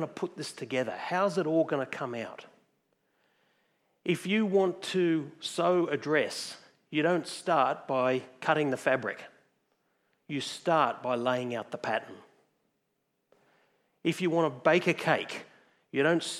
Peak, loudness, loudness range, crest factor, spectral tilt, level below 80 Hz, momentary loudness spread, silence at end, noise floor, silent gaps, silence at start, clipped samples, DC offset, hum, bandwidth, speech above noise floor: -10 dBFS; -30 LUFS; 4 LU; 22 dB; -5 dB/octave; -86 dBFS; 11 LU; 0 s; -79 dBFS; none; 0 s; under 0.1%; under 0.1%; none; 14 kHz; 50 dB